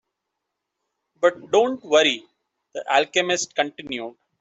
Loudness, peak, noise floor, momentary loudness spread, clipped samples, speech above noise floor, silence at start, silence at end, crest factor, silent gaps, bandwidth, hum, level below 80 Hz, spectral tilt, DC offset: -21 LUFS; -4 dBFS; -81 dBFS; 14 LU; under 0.1%; 60 dB; 1.2 s; 0.3 s; 20 dB; none; 8.2 kHz; none; -70 dBFS; -2 dB/octave; under 0.1%